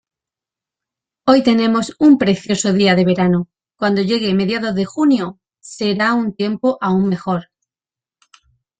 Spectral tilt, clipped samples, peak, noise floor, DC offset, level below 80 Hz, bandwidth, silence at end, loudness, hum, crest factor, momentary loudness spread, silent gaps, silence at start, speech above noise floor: -5.5 dB/octave; under 0.1%; -2 dBFS; under -90 dBFS; under 0.1%; -56 dBFS; 9.2 kHz; 1.4 s; -16 LUFS; none; 16 dB; 9 LU; none; 1.25 s; over 75 dB